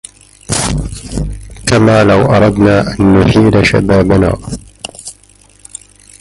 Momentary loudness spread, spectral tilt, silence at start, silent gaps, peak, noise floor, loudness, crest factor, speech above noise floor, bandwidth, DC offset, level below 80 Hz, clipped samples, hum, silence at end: 21 LU; -6 dB/octave; 0.5 s; none; 0 dBFS; -44 dBFS; -10 LUFS; 12 dB; 36 dB; 11.5 kHz; under 0.1%; -26 dBFS; under 0.1%; 50 Hz at -30 dBFS; 1.1 s